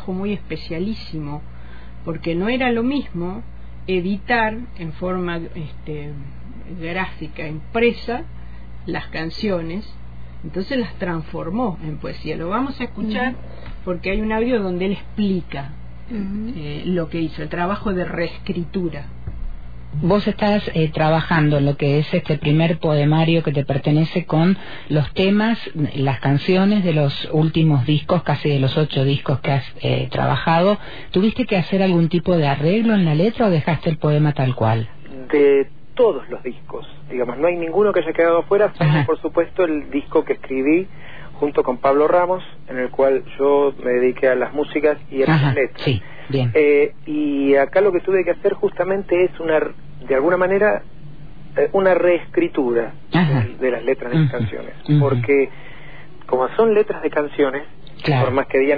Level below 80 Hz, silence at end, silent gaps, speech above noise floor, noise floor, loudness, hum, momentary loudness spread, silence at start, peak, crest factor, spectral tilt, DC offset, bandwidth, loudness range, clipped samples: -40 dBFS; 0 s; none; 22 dB; -41 dBFS; -19 LUFS; none; 15 LU; 0 s; -4 dBFS; 14 dB; -9.5 dB/octave; 3%; 5 kHz; 7 LU; under 0.1%